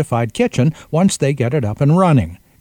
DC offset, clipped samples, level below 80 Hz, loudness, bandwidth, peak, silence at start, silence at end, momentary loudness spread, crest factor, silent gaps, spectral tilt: under 0.1%; under 0.1%; -44 dBFS; -16 LUFS; 16 kHz; 0 dBFS; 0 s; 0.25 s; 5 LU; 16 dB; none; -6.5 dB/octave